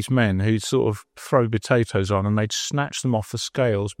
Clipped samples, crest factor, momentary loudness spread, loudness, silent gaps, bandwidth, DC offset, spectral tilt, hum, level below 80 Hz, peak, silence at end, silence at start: under 0.1%; 16 dB; 4 LU; -22 LUFS; none; 15.5 kHz; under 0.1%; -5.5 dB/octave; none; -56 dBFS; -6 dBFS; 0.05 s; 0 s